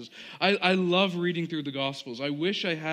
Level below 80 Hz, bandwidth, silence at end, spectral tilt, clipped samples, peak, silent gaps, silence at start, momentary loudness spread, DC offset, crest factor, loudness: -78 dBFS; 10 kHz; 0 s; -5.5 dB/octave; under 0.1%; -8 dBFS; none; 0 s; 9 LU; under 0.1%; 20 dB; -27 LUFS